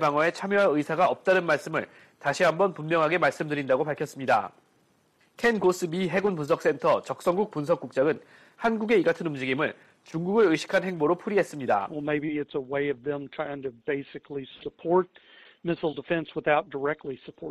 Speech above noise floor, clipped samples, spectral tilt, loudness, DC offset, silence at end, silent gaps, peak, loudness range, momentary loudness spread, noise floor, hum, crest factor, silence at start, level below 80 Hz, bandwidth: 39 dB; under 0.1%; -6 dB/octave; -26 LUFS; under 0.1%; 0 s; none; -8 dBFS; 6 LU; 11 LU; -66 dBFS; none; 18 dB; 0 s; -66 dBFS; 14 kHz